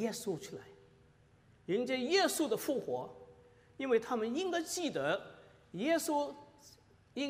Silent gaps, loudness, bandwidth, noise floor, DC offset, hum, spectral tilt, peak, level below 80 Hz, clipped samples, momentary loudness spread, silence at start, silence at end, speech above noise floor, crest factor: none; -35 LUFS; 15.5 kHz; -65 dBFS; under 0.1%; none; -3.5 dB/octave; -18 dBFS; -76 dBFS; under 0.1%; 18 LU; 0 s; 0 s; 30 dB; 18 dB